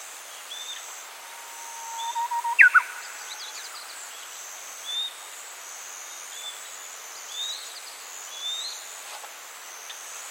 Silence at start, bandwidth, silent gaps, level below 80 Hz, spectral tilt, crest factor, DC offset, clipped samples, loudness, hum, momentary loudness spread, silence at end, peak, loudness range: 0 s; 17 kHz; none; under -90 dBFS; 5 dB/octave; 28 dB; under 0.1%; under 0.1%; -28 LUFS; none; 13 LU; 0 s; -2 dBFS; 11 LU